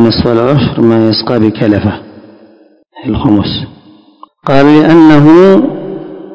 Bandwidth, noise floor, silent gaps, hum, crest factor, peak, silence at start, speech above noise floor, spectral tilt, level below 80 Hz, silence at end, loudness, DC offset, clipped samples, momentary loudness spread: 8 kHz; -43 dBFS; none; none; 8 dB; 0 dBFS; 0 s; 37 dB; -8.5 dB/octave; -34 dBFS; 0 s; -7 LUFS; under 0.1%; 7%; 18 LU